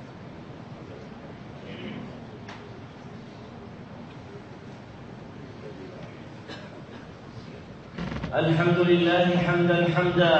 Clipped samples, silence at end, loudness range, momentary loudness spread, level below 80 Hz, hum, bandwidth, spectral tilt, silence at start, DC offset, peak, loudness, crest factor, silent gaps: under 0.1%; 0 s; 18 LU; 21 LU; -54 dBFS; none; 8 kHz; -7.5 dB/octave; 0 s; under 0.1%; -8 dBFS; -24 LUFS; 20 dB; none